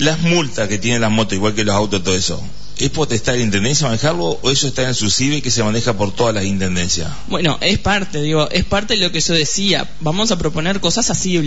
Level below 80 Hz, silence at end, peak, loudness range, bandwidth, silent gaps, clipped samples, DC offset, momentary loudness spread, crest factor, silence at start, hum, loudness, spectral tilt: -36 dBFS; 0 s; -2 dBFS; 1 LU; 8 kHz; none; under 0.1%; 7%; 4 LU; 14 dB; 0 s; none; -16 LUFS; -3.5 dB/octave